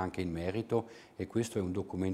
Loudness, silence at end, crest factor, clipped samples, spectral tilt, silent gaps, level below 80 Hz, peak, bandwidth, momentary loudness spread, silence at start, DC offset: -36 LUFS; 0 s; 16 dB; under 0.1%; -6.5 dB/octave; none; -64 dBFS; -18 dBFS; 15 kHz; 5 LU; 0 s; under 0.1%